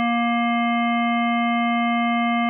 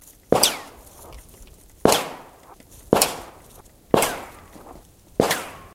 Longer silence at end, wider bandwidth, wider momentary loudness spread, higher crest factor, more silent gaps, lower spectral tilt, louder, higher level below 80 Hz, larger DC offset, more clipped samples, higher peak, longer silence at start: about the same, 0 s vs 0.1 s; second, 3.3 kHz vs 16.5 kHz; second, 0 LU vs 25 LU; second, 6 dB vs 26 dB; neither; first, -9 dB/octave vs -3 dB/octave; about the same, -20 LUFS vs -21 LUFS; second, under -90 dBFS vs -50 dBFS; neither; neither; second, -16 dBFS vs 0 dBFS; second, 0 s vs 0.3 s